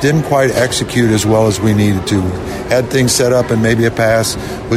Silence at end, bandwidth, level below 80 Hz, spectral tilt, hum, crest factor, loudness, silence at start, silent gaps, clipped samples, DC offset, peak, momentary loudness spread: 0 s; 16 kHz; -36 dBFS; -5 dB/octave; none; 10 dB; -13 LUFS; 0 s; none; under 0.1%; under 0.1%; -2 dBFS; 5 LU